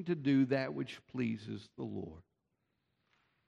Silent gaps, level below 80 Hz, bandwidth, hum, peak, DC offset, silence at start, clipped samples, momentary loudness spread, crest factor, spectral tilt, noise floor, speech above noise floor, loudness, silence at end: none; -72 dBFS; 7.4 kHz; none; -20 dBFS; under 0.1%; 0 s; under 0.1%; 15 LU; 18 dB; -8 dB/octave; -83 dBFS; 47 dB; -36 LUFS; 1.25 s